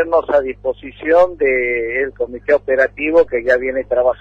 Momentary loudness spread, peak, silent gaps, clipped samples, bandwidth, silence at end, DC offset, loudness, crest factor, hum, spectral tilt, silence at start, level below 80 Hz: 9 LU; -2 dBFS; none; under 0.1%; 6.6 kHz; 0.05 s; under 0.1%; -16 LUFS; 14 dB; 50 Hz at -45 dBFS; -6.5 dB/octave; 0 s; -44 dBFS